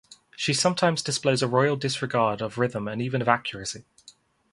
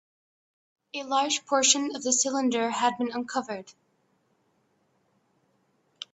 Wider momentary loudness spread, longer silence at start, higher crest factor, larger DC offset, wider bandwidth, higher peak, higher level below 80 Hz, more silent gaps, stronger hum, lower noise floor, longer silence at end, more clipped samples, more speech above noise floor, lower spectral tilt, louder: second, 9 LU vs 16 LU; second, 0.1 s vs 0.95 s; about the same, 24 dB vs 24 dB; neither; first, 11.5 kHz vs 8.4 kHz; first, -2 dBFS vs -6 dBFS; first, -62 dBFS vs -78 dBFS; neither; neither; second, -55 dBFS vs -70 dBFS; second, 0.7 s vs 2.45 s; neither; second, 31 dB vs 44 dB; first, -4 dB/octave vs -1 dB/octave; about the same, -25 LUFS vs -25 LUFS